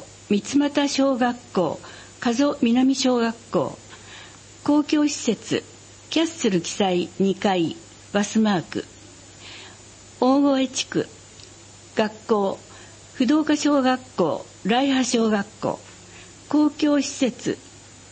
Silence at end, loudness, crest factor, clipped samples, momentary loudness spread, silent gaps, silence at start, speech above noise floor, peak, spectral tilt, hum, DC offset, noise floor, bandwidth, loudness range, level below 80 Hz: 0.35 s; -22 LUFS; 18 dB; under 0.1%; 21 LU; none; 0 s; 24 dB; -6 dBFS; -4.5 dB/octave; none; under 0.1%; -46 dBFS; 8.8 kHz; 3 LU; -60 dBFS